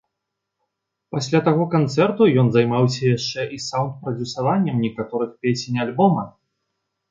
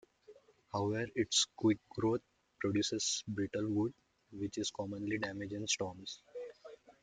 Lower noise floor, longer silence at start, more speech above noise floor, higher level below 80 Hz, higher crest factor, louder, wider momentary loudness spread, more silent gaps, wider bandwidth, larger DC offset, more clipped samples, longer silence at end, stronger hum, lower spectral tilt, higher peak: first, -80 dBFS vs -62 dBFS; first, 1.1 s vs 0.3 s; first, 61 dB vs 26 dB; first, -60 dBFS vs -70 dBFS; about the same, 18 dB vs 18 dB; first, -20 LUFS vs -36 LUFS; second, 10 LU vs 15 LU; neither; second, 7.8 kHz vs 9.6 kHz; neither; neither; first, 0.8 s vs 0.1 s; neither; first, -6.5 dB/octave vs -3.5 dB/octave; first, -4 dBFS vs -20 dBFS